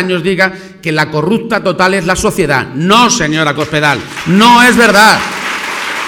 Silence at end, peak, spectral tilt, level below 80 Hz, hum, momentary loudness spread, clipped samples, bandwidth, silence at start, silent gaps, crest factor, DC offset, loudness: 0 s; 0 dBFS; -4 dB/octave; -38 dBFS; none; 11 LU; 0.8%; 20 kHz; 0 s; none; 10 dB; under 0.1%; -9 LUFS